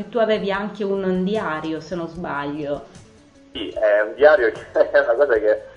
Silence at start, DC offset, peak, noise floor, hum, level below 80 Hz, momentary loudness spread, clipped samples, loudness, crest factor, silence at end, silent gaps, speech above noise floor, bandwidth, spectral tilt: 0 s; under 0.1%; 0 dBFS; -49 dBFS; none; -52 dBFS; 14 LU; under 0.1%; -20 LUFS; 20 dB; 0.05 s; none; 29 dB; 7.8 kHz; -6.5 dB/octave